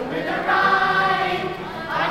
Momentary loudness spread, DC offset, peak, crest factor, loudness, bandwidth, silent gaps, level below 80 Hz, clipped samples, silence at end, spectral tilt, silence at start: 10 LU; under 0.1%; -6 dBFS; 14 dB; -20 LUFS; 16 kHz; none; -50 dBFS; under 0.1%; 0 s; -5 dB/octave; 0 s